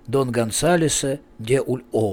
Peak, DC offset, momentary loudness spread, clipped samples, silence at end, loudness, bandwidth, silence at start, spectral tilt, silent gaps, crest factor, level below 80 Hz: -8 dBFS; under 0.1%; 7 LU; under 0.1%; 0 s; -21 LUFS; 18 kHz; 0.05 s; -4.5 dB/octave; none; 14 dB; -46 dBFS